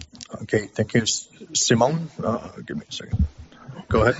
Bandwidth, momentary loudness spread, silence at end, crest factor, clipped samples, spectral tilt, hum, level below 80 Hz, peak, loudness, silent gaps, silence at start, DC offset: 8 kHz; 16 LU; 0 s; 20 dB; under 0.1%; -4.5 dB/octave; none; -38 dBFS; -4 dBFS; -24 LUFS; none; 0 s; under 0.1%